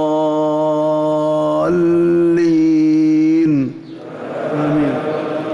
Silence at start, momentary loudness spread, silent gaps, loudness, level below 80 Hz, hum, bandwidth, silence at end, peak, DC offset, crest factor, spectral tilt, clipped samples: 0 s; 11 LU; none; -15 LUFS; -52 dBFS; none; 7.4 kHz; 0 s; -8 dBFS; under 0.1%; 6 dB; -8 dB/octave; under 0.1%